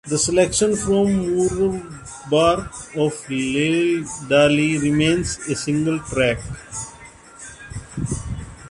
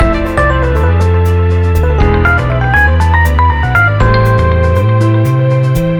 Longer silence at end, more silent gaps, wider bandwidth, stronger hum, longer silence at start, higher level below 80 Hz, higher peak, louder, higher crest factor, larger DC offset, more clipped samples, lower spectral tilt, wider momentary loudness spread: about the same, 0 s vs 0 s; neither; second, 11.5 kHz vs 17.5 kHz; neither; about the same, 0.05 s vs 0 s; second, -42 dBFS vs -16 dBFS; second, -4 dBFS vs 0 dBFS; second, -20 LUFS vs -10 LUFS; first, 18 dB vs 8 dB; neither; neither; second, -4.5 dB/octave vs -7.5 dB/octave; first, 16 LU vs 2 LU